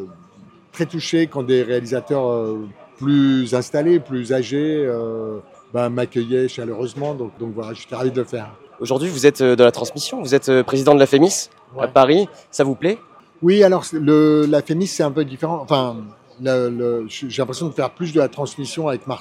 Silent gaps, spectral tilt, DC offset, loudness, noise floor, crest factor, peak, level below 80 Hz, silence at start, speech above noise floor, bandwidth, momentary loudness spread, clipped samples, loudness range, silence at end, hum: none; -5.5 dB/octave; under 0.1%; -18 LUFS; -47 dBFS; 18 dB; 0 dBFS; -66 dBFS; 0 s; 29 dB; 15 kHz; 14 LU; under 0.1%; 7 LU; 0 s; none